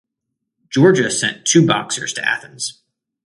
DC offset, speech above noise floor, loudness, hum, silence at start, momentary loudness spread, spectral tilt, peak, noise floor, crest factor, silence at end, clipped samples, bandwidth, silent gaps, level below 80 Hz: under 0.1%; 62 dB; -16 LUFS; none; 0.7 s; 13 LU; -4 dB/octave; 0 dBFS; -78 dBFS; 18 dB; 0.55 s; under 0.1%; 11.5 kHz; none; -60 dBFS